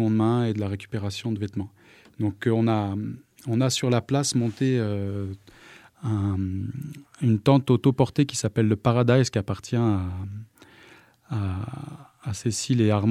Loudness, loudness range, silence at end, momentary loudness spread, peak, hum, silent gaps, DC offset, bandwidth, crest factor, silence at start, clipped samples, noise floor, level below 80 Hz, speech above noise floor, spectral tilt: -25 LUFS; 5 LU; 0 s; 15 LU; -4 dBFS; none; none; under 0.1%; 14.5 kHz; 20 dB; 0 s; under 0.1%; -53 dBFS; -56 dBFS; 29 dB; -6 dB/octave